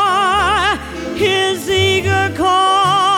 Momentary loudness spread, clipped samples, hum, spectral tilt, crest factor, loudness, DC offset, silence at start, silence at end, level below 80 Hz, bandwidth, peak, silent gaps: 5 LU; under 0.1%; none; -3.5 dB/octave; 12 dB; -14 LUFS; under 0.1%; 0 s; 0 s; -38 dBFS; 17.5 kHz; -2 dBFS; none